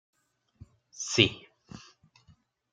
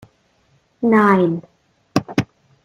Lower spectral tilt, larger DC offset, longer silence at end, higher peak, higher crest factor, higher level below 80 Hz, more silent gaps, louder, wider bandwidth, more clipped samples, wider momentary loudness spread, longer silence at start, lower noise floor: second, -3 dB/octave vs -7 dB/octave; neither; first, 0.95 s vs 0.4 s; about the same, -4 dBFS vs -2 dBFS; first, 30 dB vs 18 dB; second, -62 dBFS vs -56 dBFS; neither; second, -26 LUFS vs -18 LUFS; second, 9.6 kHz vs 15 kHz; neither; first, 26 LU vs 13 LU; first, 0.95 s vs 0.8 s; first, -64 dBFS vs -60 dBFS